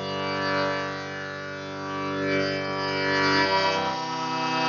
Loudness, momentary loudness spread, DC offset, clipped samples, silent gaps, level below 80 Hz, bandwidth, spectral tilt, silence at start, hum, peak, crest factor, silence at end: -26 LUFS; 12 LU; under 0.1%; under 0.1%; none; -68 dBFS; 7.2 kHz; -2 dB/octave; 0 s; none; -10 dBFS; 16 dB; 0 s